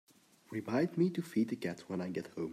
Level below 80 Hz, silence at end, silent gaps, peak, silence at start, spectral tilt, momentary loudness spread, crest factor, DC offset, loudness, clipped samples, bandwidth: -80 dBFS; 0 s; none; -20 dBFS; 0.5 s; -7.5 dB/octave; 9 LU; 16 dB; under 0.1%; -36 LUFS; under 0.1%; 14.5 kHz